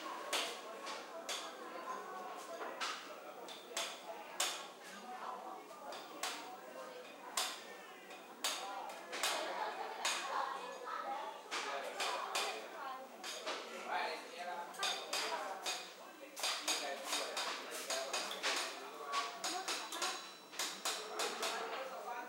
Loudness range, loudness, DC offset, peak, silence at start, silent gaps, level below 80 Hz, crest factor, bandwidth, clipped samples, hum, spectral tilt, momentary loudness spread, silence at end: 5 LU; -42 LUFS; under 0.1%; -20 dBFS; 0 s; none; under -90 dBFS; 24 dB; 16 kHz; under 0.1%; none; 0.5 dB/octave; 12 LU; 0 s